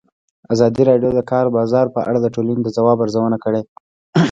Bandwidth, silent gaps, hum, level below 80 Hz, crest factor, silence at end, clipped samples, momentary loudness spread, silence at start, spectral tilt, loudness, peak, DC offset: 7.8 kHz; 3.68-4.13 s; none; -52 dBFS; 16 dB; 0 s; under 0.1%; 7 LU; 0.5 s; -7.5 dB/octave; -17 LUFS; 0 dBFS; under 0.1%